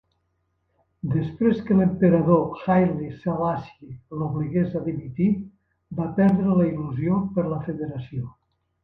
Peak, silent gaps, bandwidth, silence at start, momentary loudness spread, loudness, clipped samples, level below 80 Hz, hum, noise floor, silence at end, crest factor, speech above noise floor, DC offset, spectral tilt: -4 dBFS; none; 4.5 kHz; 1.05 s; 15 LU; -23 LUFS; under 0.1%; -52 dBFS; none; -72 dBFS; 0.5 s; 20 dB; 50 dB; under 0.1%; -11.5 dB/octave